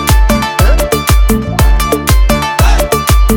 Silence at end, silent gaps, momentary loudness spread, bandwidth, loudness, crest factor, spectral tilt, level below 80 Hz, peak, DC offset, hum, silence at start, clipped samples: 0 s; none; 1 LU; 18 kHz; -11 LUFS; 8 dB; -5 dB/octave; -10 dBFS; 0 dBFS; under 0.1%; none; 0 s; under 0.1%